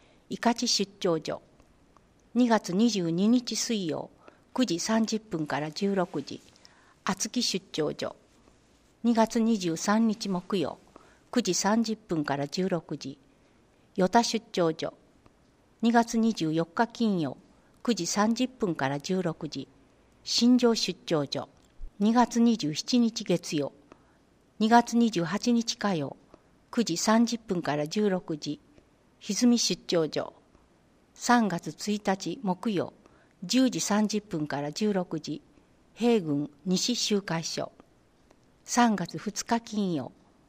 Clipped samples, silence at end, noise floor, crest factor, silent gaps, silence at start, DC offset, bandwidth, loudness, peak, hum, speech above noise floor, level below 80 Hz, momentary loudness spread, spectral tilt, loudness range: under 0.1%; 0.4 s; -63 dBFS; 22 dB; none; 0.3 s; under 0.1%; 15.5 kHz; -28 LUFS; -6 dBFS; none; 36 dB; -62 dBFS; 13 LU; -4.5 dB/octave; 4 LU